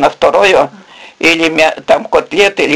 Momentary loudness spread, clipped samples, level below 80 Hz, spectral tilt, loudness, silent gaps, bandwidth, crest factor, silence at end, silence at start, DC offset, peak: 5 LU; 0.4%; -44 dBFS; -3 dB/octave; -10 LUFS; none; 16 kHz; 10 dB; 0 s; 0 s; 0.4%; 0 dBFS